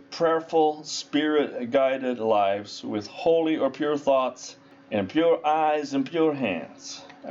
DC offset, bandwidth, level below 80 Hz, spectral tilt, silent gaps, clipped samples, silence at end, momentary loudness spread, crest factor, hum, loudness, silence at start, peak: under 0.1%; 7.8 kHz; -72 dBFS; -4.5 dB/octave; none; under 0.1%; 0 s; 10 LU; 12 dB; none; -25 LUFS; 0.1 s; -12 dBFS